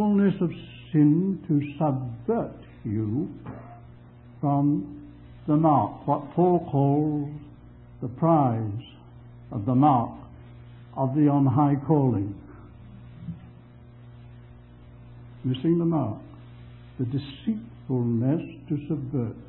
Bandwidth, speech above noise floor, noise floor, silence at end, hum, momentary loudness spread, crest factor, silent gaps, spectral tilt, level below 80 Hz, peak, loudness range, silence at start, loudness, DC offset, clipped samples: 4.2 kHz; 24 dB; -48 dBFS; 0 s; 60 Hz at -50 dBFS; 22 LU; 18 dB; none; -13 dB/octave; -54 dBFS; -8 dBFS; 6 LU; 0 s; -25 LUFS; under 0.1%; under 0.1%